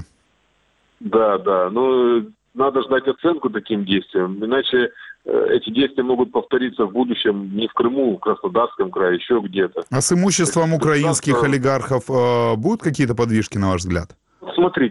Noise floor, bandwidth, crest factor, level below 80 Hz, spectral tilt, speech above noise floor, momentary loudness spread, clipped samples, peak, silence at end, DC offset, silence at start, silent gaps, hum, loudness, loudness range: -62 dBFS; 12 kHz; 14 dB; -50 dBFS; -5 dB/octave; 44 dB; 6 LU; under 0.1%; -4 dBFS; 0 s; under 0.1%; 0 s; none; none; -19 LUFS; 2 LU